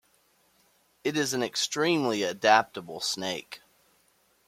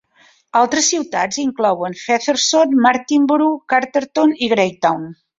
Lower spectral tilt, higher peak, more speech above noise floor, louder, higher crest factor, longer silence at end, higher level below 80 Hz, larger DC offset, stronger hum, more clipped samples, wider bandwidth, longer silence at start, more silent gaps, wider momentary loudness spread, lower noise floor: about the same, -3 dB/octave vs -2.5 dB/octave; second, -6 dBFS vs -2 dBFS; about the same, 40 dB vs 37 dB; second, -27 LUFS vs -16 LUFS; first, 24 dB vs 14 dB; first, 0.9 s vs 0.25 s; second, -74 dBFS vs -62 dBFS; neither; neither; neither; first, 16.5 kHz vs 7.8 kHz; first, 1.05 s vs 0.55 s; neither; first, 15 LU vs 6 LU; first, -67 dBFS vs -53 dBFS